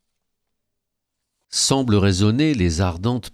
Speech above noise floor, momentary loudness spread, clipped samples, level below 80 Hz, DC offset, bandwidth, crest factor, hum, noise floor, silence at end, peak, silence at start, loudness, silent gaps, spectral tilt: 60 dB; 6 LU; under 0.1%; -40 dBFS; under 0.1%; 13.5 kHz; 18 dB; none; -79 dBFS; 0.05 s; -4 dBFS; 1.5 s; -19 LUFS; none; -5 dB/octave